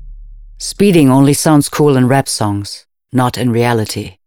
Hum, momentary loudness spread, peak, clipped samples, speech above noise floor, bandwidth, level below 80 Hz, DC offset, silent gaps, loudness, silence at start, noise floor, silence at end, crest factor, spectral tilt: none; 14 LU; 0 dBFS; under 0.1%; 21 dB; 18.5 kHz; -40 dBFS; under 0.1%; none; -12 LUFS; 0 s; -33 dBFS; 0.15 s; 12 dB; -5.5 dB/octave